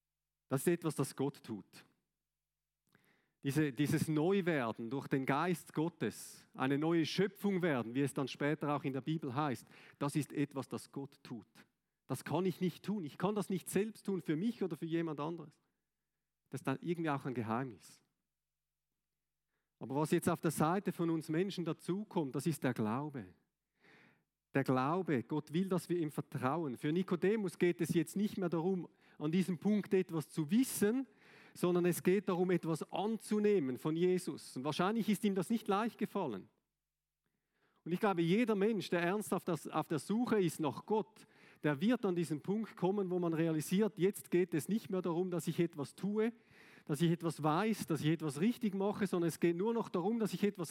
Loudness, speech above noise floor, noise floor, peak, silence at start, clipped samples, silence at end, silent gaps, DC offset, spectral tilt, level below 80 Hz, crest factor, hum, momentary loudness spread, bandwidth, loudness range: -36 LUFS; over 54 dB; under -90 dBFS; -18 dBFS; 0.5 s; under 0.1%; 0 s; none; under 0.1%; -6.5 dB/octave; -84 dBFS; 18 dB; none; 8 LU; 17 kHz; 6 LU